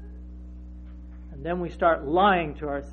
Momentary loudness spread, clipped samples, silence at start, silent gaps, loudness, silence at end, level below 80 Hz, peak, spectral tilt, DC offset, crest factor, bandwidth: 23 LU; under 0.1%; 0 s; none; -24 LUFS; 0 s; -42 dBFS; -8 dBFS; -8 dB/octave; under 0.1%; 18 dB; 6.8 kHz